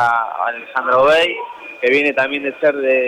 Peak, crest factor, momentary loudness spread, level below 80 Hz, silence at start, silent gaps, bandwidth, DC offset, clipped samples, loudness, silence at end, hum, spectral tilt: -4 dBFS; 12 dB; 9 LU; -56 dBFS; 0 s; none; 11.5 kHz; under 0.1%; under 0.1%; -16 LUFS; 0 s; none; -4 dB/octave